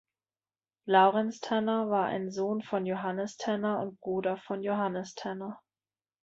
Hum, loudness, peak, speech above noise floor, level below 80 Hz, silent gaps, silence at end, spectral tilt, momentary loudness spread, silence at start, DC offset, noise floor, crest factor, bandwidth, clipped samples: none; -30 LUFS; -10 dBFS; over 60 dB; -76 dBFS; none; 0.65 s; -6 dB/octave; 13 LU; 0.85 s; under 0.1%; under -90 dBFS; 20 dB; 7.8 kHz; under 0.1%